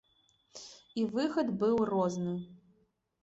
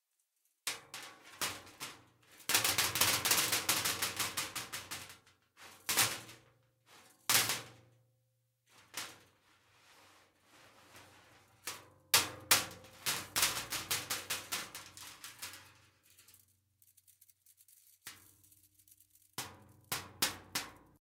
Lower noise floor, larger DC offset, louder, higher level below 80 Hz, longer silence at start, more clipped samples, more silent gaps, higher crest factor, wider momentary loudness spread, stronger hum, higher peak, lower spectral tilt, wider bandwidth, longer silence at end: second, -73 dBFS vs -80 dBFS; neither; about the same, -32 LUFS vs -34 LUFS; about the same, -70 dBFS vs -74 dBFS; about the same, 0.55 s vs 0.65 s; neither; neither; second, 16 dB vs 30 dB; about the same, 20 LU vs 20 LU; neither; second, -18 dBFS vs -8 dBFS; first, -6.5 dB/octave vs 0 dB/octave; second, 8 kHz vs 17.5 kHz; first, 0.65 s vs 0.25 s